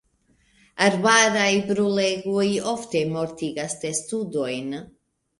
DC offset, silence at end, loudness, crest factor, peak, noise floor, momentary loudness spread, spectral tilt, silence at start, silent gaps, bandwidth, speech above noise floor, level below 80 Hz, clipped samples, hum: under 0.1%; 0.55 s; -22 LUFS; 22 dB; -2 dBFS; -64 dBFS; 12 LU; -3.5 dB/octave; 0.75 s; none; 11.5 kHz; 41 dB; -62 dBFS; under 0.1%; none